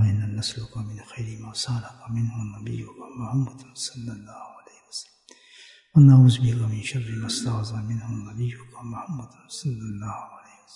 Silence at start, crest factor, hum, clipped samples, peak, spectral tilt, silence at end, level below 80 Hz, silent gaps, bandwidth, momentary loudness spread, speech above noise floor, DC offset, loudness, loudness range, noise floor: 0 s; 20 dB; none; under 0.1%; -6 dBFS; -6 dB/octave; 0.35 s; -56 dBFS; none; 11 kHz; 20 LU; 30 dB; under 0.1%; -24 LUFS; 12 LU; -54 dBFS